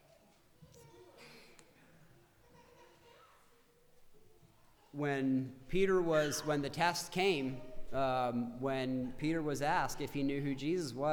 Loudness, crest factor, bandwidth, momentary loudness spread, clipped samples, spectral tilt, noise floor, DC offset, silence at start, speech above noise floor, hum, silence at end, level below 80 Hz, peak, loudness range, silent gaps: -35 LUFS; 20 dB; over 20 kHz; 10 LU; under 0.1%; -5 dB/octave; -66 dBFS; under 0.1%; 0.6 s; 32 dB; none; 0 s; -56 dBFS; -18 dBFS; 8 LU; none